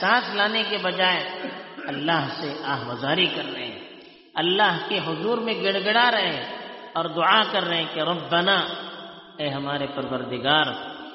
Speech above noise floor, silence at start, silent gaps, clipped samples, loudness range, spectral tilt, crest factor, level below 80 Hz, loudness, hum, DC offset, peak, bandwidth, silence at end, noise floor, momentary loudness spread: 22 dB; 0 s; none; under 0.1%; 3 LU; -1 dB/octave; 20 dB; -68 dBFS; -23 LUFS; none; under 0.1%; -4 dBFS; 6 kHz; 0 s; -46 dBFS; 15 LU